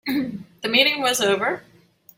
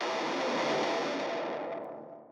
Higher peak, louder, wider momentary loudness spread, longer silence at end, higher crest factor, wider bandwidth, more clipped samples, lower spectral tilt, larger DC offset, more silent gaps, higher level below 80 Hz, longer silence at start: first, -2 dBFS vs -18 dBFS; first, -20 LUFS vs -32 LUFS; first, 14 LU vs 11 LU; first, 0.55 s vs 0 s; first, 20 dB vs 14 dB; first, 16.5 kHz vs 12 kHz; neither; second, -2 dB/octave vs -3.5 dB/octave; neither; neither; first, -64 dBFS vs under -90 dBFS; about the same, 0.05 s vs 0 s